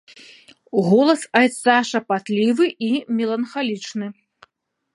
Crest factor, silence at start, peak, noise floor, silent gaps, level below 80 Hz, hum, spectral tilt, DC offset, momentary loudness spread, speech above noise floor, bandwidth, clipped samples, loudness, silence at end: 20 dB; 0.75 s; 0 dBFS; -65 dBFS; none; -72 dBFS; none; -5 dB/octave; under 0.1%; 10 LU; 46 dB; 11.5 kHz; under 0.1%; -19 LUFS; 0.8 s